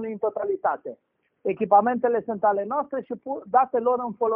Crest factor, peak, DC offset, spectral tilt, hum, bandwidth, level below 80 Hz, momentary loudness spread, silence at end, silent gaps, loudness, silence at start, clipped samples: 18 dB; -6 dBFS; under 0.1%; -6.5 dB/octave; none; 3.2 kHz; -70 dBFS; 13 LU; 0 s; none; -24 LUFS; 0 s; under 0.1%